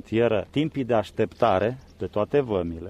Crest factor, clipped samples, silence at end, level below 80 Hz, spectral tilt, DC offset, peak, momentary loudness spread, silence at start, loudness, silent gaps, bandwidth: 18 dB; under 0.1%; 0 s; -50 dBFS; -7.5 dB/octave; under 0.1%; -6 dBFS; 7 LU; 0.1 s; -25 LUFS; none; 10.5 kHz